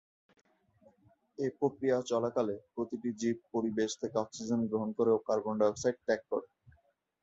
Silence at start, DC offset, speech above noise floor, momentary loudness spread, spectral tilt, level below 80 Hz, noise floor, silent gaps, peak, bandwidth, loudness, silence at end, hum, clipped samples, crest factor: 1.4 s; under 0.1%; 38 dB; 8 LU; -5.5 dB/octave; -72 dBFS; -70 dBFS; none; -16 dBFS; 8 kHz; -33 LUFS; 0.8 s; none; under 0.1%; 18 dB